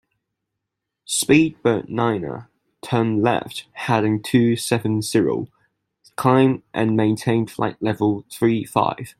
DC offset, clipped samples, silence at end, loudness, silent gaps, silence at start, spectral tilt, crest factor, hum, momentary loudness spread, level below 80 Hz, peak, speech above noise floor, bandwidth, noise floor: under 0.1%; under 0.1%; 0.1 s; -20 LUFS; none; 1.1 s; -5.5 dB/octave; 18 dB; none; 11 LU; -58 dBFS; -2 dBFS; 62 dB; 16 kHz; -81 dBFS